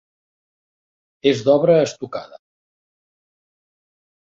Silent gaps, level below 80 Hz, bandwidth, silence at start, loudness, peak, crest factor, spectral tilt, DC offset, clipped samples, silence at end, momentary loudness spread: none; -64 dBFS; 7.8 kHz; 1.25 s; -17 LUFS; -2 dBFS; 20 dB; -6 dB/octave; under 0.1%; under 0.1%; 2.1 s; 16 LU